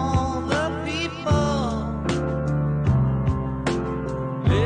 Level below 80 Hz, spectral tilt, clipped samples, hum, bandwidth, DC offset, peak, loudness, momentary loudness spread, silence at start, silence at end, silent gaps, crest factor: -32 dBFS; -7 dB/octave; under 0.1%; none; 10 kHz; under 0.1%; -8 dBFS; -24 LUFS; 5 LU; 0 s; 0 s; none; 14 dB